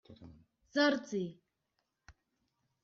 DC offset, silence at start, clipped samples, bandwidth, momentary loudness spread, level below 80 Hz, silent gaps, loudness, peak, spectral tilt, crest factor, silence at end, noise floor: under 0.1%; 0.1 s; under 0.1%; 7.4 kHz; 26 LU; -72 dBFS; none; -34 LUFS; -18 dBFS; -3 dB/octave; 20 dB; 0.75 s; -84 dBFS